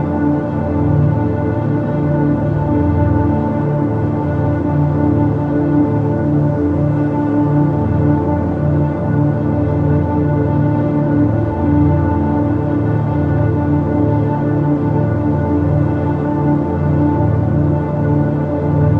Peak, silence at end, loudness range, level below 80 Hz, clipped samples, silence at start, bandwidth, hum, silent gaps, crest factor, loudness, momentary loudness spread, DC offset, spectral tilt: -2 dBFS; 0 s; 1 LU; -38 dBFS; under 0.1%; 0 s; 4 kHz; none; none; 12 dB; -15 LUFS; 2 LU; under 0.1%; -11.5 dB/octave